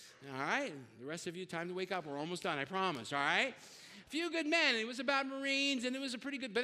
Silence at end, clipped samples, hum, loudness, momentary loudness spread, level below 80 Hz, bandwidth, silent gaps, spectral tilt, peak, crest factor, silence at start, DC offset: 0 s; under 0.1%; none; -36 LUFS; 12 LU; -84 dBFS; 15 kHz; none; -3 dB/octave; -18 dBFS; 20 dB; 0 s; under 0.1%